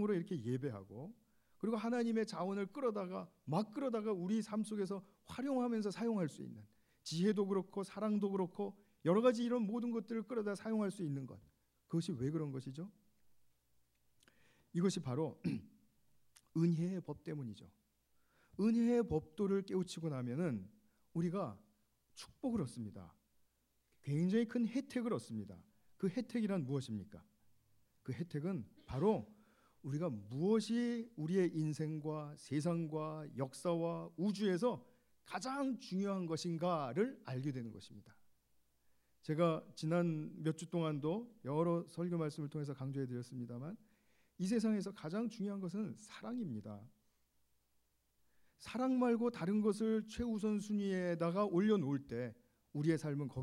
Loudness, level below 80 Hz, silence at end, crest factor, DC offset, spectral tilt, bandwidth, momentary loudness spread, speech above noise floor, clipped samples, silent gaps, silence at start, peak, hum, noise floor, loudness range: -39 LUFS; -72 dBFS; 0 s; 20 dB; under 0.1%; -7 dB/octave; 12 kHz; 13 LU; 41 dB; under 0.1%; none; 0 s; -20 dBFS; none; -80 dBFS; 6 LU